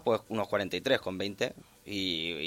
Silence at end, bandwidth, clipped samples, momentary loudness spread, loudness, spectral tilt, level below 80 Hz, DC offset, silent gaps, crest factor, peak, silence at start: 0 s; 16.5 kHz; under 0.1%; 6 LU; -32 LUFS; -4.5 dB/octave; -64 dBFS; under 0.1%; none; 20 dB; -12 dBFS; 0 s